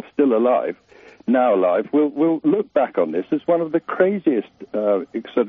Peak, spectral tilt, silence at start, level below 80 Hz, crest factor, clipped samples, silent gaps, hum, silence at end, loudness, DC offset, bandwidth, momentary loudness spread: -2 dBFS; -6 dB/octave; 0.2 s; -70 dBFS; 16 dB; under 0.1%; none; none; 0 s; -20 LUFS; under 0.1%; 3.9 kHz; 8 LU